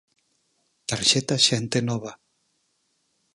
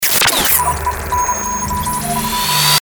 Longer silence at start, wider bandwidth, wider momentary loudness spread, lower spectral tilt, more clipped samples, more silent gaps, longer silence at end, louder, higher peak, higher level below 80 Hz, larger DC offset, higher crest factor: first, 0.9 s vs 0 s; second, 11.5 kHz vs over 20 kHz; first, 15 LU vs 8 LU; first, -3 dB/octave vs -1.5 dB/octave; neither; neither; first, 1.2 s vs 0.15 s; second, -22 LUFS vs -14 LUFS; second, -4 dBFS vs 0 dBFS; second, -62 dBFS vs -32 dBFS; neither; first, 22 dB vs 16 dB